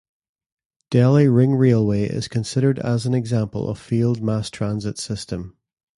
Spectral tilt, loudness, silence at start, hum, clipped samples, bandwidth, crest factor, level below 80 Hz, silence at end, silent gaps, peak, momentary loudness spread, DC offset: -7.5 dB/octave; -20 LUFS; 0.9 s; none; under 0.1%; 11.5 kHz; 16 dB; -50 dBFS; 0.5 s; none; -4 dBFS; 12 LU; under 0.1%